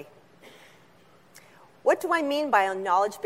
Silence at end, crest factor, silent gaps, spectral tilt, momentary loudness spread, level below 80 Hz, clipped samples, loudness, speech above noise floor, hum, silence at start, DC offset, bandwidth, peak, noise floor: 0 s; 20 dB; none; -3.5 dB/octave; 2 LU; -80 dBFS; under 0.1%; -25 LUFS; 33 dB; none; 0 s; under 0.1%; 16 kHz; -8 dBFS; -57 dBFS